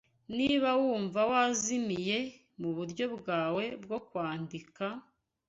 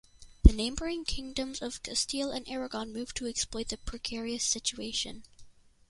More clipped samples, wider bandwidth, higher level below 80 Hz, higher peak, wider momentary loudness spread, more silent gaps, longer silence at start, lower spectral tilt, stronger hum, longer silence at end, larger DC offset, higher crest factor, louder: neither; second, 8.2 kHz vs 11.5 kHz; second, -70 dBFS vs -34 dBFS; second, -14 dBFS vs -2 dBFS; about the same, 12 LU vs 12 LU; neither; about the same, 0.3 s vs 0.2 s; about the same, -4 dB/octave vs -4 dB/octave; neither; about the same, 0.5 s vs 0.4 s; neither; second, 18 dB vs 28 dB; about the same, -32 LUFS vs -32 LUFS